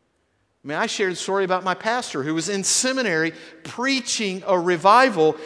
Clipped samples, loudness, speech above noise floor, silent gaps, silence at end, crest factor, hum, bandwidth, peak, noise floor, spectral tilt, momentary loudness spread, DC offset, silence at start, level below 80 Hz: under 0.1%; -21 LUFS; 47 dB; none; 0 s; 20 dB; none; 11 kHz; -2 dBFS; -68 dBFS; -3 dB/octave; 11 LU; under 0.1%; 0.65 s; -70 dBFS